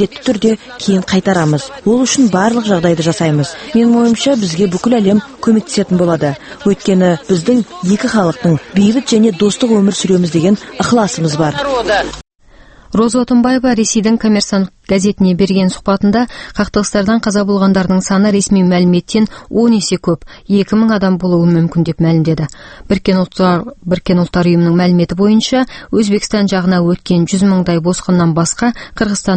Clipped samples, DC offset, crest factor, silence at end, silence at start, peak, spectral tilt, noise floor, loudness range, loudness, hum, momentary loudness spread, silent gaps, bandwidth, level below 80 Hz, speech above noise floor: under 0.1%; under 0.1%; 12 dB; 0 s; 0 s; 0 dBFS; -5.5 dB/octave; -41 dBFS; 1 LU; -12 LUFS; none; 5 LU; none; 8.8 kHz; -40 dBFS; 29 dB